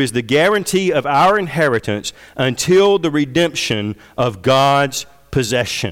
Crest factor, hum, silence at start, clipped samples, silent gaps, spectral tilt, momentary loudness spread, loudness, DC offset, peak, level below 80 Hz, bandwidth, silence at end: 10 dB; none; 0 s; under 0.1%; none; -4.5 dB/octave; 9 LU; -16 LUFS; under 0.1%; -6 dBFS; -46 dBFS; 17 kHz; 0 s